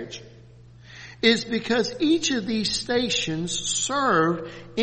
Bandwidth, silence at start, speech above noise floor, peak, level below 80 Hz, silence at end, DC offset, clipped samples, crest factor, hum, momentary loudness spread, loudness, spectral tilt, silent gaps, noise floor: 8.8 kHz; 0 s; 24 dB; -4 dBFS; -54 dBFS; 0 s; under 0.1%; under 0.1%; 20 dB; none; 13 LU; -23 LUFS; -3 dB/octave; none; -48 dBFS